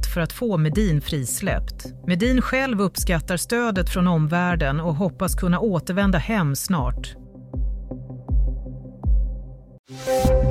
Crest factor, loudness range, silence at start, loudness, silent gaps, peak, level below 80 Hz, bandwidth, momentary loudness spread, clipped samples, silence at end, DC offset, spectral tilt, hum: 16 dB; 6 LU; 0 s; -23 LUFS; 9.79-9.84 s; -6 dBFS; -28 dBFS; 16 kHz; 14 LU; under 0.1%; 0 s; under 0.1%; -5.5 dB/octave; none